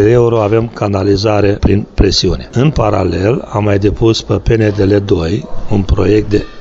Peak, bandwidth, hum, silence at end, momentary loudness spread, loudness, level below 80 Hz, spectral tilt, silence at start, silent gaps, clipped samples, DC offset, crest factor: 0 dBFS; 7.8 kHz; none; 0 s; 4 LU; -12 LUFS; -24 dBFS; -6.5 dB/octave; 0 s; none; under 0.1%; under 0.1%; 10 dB